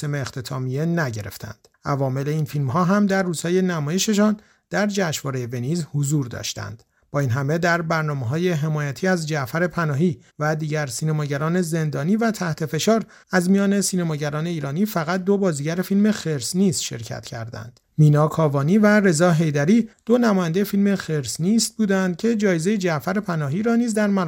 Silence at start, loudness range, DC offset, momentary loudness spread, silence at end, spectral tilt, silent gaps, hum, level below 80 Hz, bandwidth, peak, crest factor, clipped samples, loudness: 0 s; 5 LU; under 0.1%; 10 LU; 0 s; -5.5 dB/octave; none; none; -58 dBFS; 17 kHz; -4 dBFS; 16 dB; under 0.1%; -21 LUFS